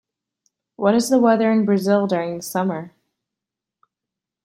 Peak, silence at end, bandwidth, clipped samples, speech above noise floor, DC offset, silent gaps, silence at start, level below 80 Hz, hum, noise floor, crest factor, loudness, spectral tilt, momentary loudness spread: -4 dBFS; 1.55 s; 16 kHz; under 0.1%; 68 dB; under 0.1%; none; 0.8 s; -66 dBFS; none; -86 dBFS; 18 dB; -19 LUFS; -6 dB/octave; 9 LU